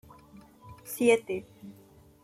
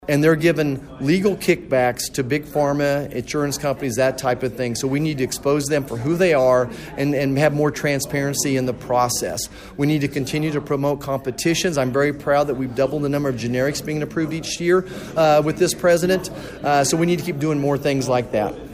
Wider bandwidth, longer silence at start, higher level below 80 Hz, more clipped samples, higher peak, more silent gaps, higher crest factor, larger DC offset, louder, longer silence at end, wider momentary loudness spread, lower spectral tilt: about the same, 15.5 kHz vs 15.5 kHz; first, 0.65 s vs 0 s; second, -66 dBFS vs -46 dBFS; neither; second, -10 dBFS vs -4 dBFS; neither; first, 22 dB vs 16 dB; neither; second, -28 LUFS vs -20 LUFS; first, 0.55 s vs 0 s; first, 25 LU vs 7 LU; about the same, -4 dB/octave vs -5 dB/octave